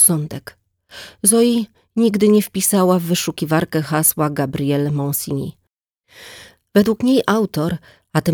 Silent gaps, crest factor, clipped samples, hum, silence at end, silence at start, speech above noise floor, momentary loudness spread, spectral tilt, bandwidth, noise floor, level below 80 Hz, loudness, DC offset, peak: none; 16 dB; under 0.1%; none; 0 s; 0 s; 53 dB; 16 LU; -4.5 dB/octave; over 20 kHz; -70 dBFS; -52 dBFS; -17 LUFS; under 0.1%; -2 dBFS